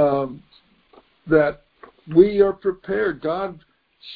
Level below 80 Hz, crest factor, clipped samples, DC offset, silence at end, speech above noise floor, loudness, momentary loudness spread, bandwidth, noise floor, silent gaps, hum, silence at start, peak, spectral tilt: -50 dBFS; 20 dB; under 0.1%; under 0.1%; 0 s; 38 dB; -20 LUFS; 13 LU; 4.9 kHz; -57 dBFS; none; none; 0 s; -2 dBFS; -10 dB/octave